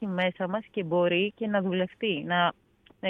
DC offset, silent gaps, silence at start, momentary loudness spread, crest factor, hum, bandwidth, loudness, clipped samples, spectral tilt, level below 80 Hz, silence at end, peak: under 0.1%; none; 0 s; 6 LU; 18 dB; none; 4 kHz; -28 LUFS; under 0.1%; -8.5 dB/octave; -70 dBFS; 0 s; -10 dBFS